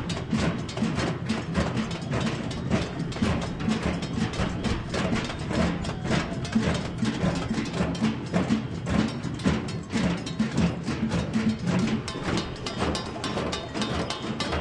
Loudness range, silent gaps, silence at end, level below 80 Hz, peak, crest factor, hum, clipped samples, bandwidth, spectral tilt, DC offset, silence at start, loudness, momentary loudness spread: 1 LU; none; 0 s; -42 dBFS; -10 dBFS; 18 dB; none; under 0.1%; 11.5 kHz; -6 dB/octave; under 0.1%; 0 s; -28 LUFS; 4 LU